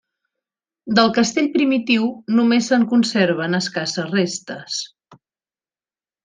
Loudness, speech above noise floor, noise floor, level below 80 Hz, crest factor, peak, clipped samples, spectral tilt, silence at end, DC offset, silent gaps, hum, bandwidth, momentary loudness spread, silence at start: -18 LUFS; over 72 dB; under -90 dBFS; -66 dBFS; 18 dB; -2 dBFS; under 0.1%; -4.5 dB/octave; 1.1 s; under 0.1%; none; none; 9.6 kHz; 11 LU; 0.85 s